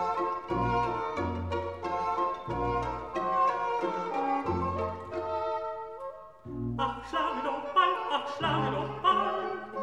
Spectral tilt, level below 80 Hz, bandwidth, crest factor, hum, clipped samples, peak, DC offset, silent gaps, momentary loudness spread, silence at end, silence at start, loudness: -6.5 dB/octave; -50 dBFS; 10.5 kHz; 18 dB; none; under 0.1%; -12 dBFS; 0.1%; none; 9 LU; 0 s; 0 s; -31 LUFS